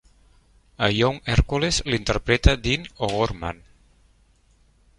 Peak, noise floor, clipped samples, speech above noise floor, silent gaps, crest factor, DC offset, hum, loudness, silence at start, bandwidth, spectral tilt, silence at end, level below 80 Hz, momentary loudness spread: -2 dBFS; -59 dBFS; under 0.1%; 37 dB; none; 22 dB; under 0.1%; none; -23 LUFS; 0.8 s; 11.5 kHz; -4.5 dB/octave; 1.45 s; -30 dBFS; 8 LU